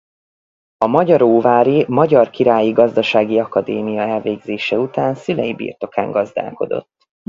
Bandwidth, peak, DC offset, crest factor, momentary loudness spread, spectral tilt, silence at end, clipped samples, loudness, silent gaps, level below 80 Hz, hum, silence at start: 7.4 kHz; 0 dBFS; under 0.1%; 16 dB; 10 LU; -7.5 dB/octave; 0.5 s; under 0.1%; -16 LUFS; none; -58 dBFS; none; 0.8 s